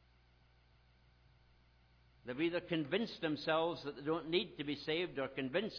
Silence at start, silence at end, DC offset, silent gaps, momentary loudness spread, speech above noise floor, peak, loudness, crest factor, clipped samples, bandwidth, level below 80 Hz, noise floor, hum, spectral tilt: 2.25 s; 0 s; under 0.1%; none; 6 LU; 30 dB; -22 dBFS; -38 LUFS; 18 dB; under 0.1%; 5.4 kHz; -70 dBFS; -69 dBFS; 60 Hz at -70 dBFS; -3 dB/octave